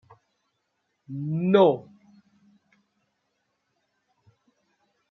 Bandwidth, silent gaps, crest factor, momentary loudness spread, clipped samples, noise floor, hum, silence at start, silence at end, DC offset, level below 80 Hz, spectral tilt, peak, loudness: 6.2 kHz; none; 24 dB; 16 LU; under 0.1%; -77 dBFS; none; 1.1 s; 3.3 s; under 0.1%; -78 dBFS; -9 dB/octave; -6 dBFS; -23 LUFS